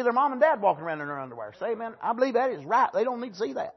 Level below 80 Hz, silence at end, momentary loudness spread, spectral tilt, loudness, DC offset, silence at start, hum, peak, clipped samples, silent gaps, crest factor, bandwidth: -78 dBFS; 0.05 s; 12 LU; -6 dB/octave; -27 LUFS; under 0.1%; 0 s; none; -8 dBFS; under 0.1%; none; 18 dB; 6.2 kHz